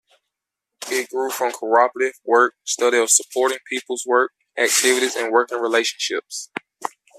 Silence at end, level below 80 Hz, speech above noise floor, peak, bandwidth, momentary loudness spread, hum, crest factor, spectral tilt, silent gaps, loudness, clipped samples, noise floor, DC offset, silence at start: 0.3 s; -78 dBFS; 64 dB; 0 dBFS; 15 kHz; 14 LU; none; 20 dB; 0.5 dB/octave; none; -19 LUFS; under 0.1%; -83 dBFS; under 0.1%; 0.8 s